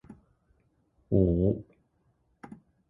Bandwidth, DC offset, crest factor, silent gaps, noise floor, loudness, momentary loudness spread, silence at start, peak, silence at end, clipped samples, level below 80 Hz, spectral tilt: 3.3 kHz; under 0.1%; 20 dB; none; -71 dBFS; -27 LUFS; 25 LU; 0.1 s; -12 dBFS; 0.45 s; under 0.1%; -44 dBFS; -13 dB/octave